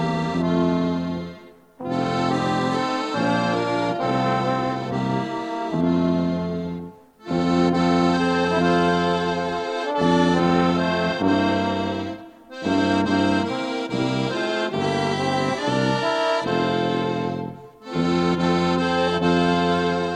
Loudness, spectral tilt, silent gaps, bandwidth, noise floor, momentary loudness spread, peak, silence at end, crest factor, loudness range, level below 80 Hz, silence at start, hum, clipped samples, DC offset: -22 LUFS; -6 dB/octave; none; 10 kHz; -44 dBFS; 9 LU; -6 dBFS; 0 s; 14 dB; 3 LU; -52 dBFS; 0 s; none; under 0.1%; under 0.1%